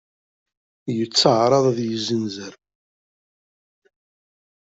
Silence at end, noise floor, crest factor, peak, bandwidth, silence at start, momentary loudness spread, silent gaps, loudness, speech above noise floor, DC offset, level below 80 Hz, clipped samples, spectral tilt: 2.2 s; under -90 dBFS; 22 dB; -2 dBFS; 8.2 kHz; 0.85 s; 19 LU; none; -20 LUFS; over 70 dB; under 0.1%; -66 dBFS; under 0.1%; -5 dB/octave